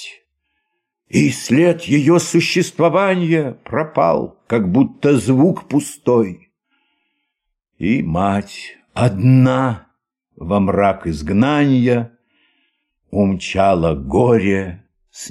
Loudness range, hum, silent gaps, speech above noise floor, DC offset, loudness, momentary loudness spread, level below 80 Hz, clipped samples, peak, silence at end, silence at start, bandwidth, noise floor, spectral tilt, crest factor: 3 LU; none; none; 60 dB; under 0.1%; -16 LUFS; 10 LU; -44 dBFS; under 0.1%; -2 dBFS; 0 s; 0 s; 14 kHz; -75 dBFS; -6.5 dB/octave; 14 dB